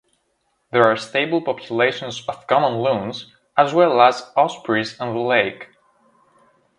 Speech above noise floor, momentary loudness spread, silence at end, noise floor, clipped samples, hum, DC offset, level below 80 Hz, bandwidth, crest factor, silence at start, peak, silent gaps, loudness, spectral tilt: 50 dB; 12 LU; 1.15 s; -69 dBFS; under 0.1%; none; under 0.1%; -64 dBFS; 11 kHz; 20 dB; 0.75 s; 0 dBFS; none; -19 LUFS; -5 dB/octave